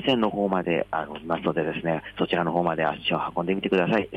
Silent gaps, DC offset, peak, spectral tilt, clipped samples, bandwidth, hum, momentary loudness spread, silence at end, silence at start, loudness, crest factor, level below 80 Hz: none; under 0.1%; -10 dBFS; -7.5 dB/octave; under 0.1%; 9 kHz; none; 5 LU; 0 s; 0 s; -25 LUFS; 16 dB; -56 dBFS